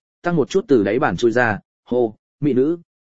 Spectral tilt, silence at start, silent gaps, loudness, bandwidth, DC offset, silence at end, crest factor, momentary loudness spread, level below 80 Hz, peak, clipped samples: -7 dB/octave; 0.2 s; 1.65-1.83 s, 2.19-2.39 s; -19 LUFS; 7.8 kHz; 0.8%; 0.15 s; 18 dB; 7 LU; -52 dBFS; -2 dBFS; under 0.1%